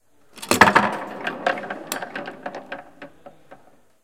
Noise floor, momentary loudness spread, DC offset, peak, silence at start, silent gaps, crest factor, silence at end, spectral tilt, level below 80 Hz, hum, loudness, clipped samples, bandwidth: -53 dBFS; 22 LU; 0.3%; 0 dBFS; 0.35 s; none; 24 dB; 0.5 s; -3 dB/octave; -60 dBFS; none; -21 LUFS; under 0.1%; 16.5 kHz